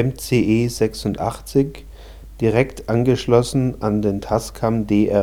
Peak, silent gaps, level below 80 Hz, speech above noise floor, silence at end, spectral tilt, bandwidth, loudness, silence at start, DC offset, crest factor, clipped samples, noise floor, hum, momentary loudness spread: 0 dBFS; none; -38 dBFS; 19 dB; 0 s; -6.5 dB/octave; 18 kHz; -20 LUFS; 0 s; under 0.1%; 18 dB; under 0.1%; -38 dBFS; none; 6 LU